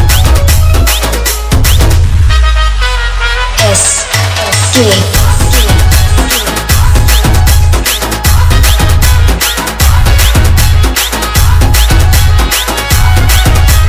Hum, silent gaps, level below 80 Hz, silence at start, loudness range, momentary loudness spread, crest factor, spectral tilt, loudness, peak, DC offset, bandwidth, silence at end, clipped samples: none; none; -10 dBFS; 0 s; 1 LU; 3 LU; 6 dB; -3.5 dB/octave; -8 LUFS; 0 dBFS; under 0.1%; 20 kHz; 0 s; 4%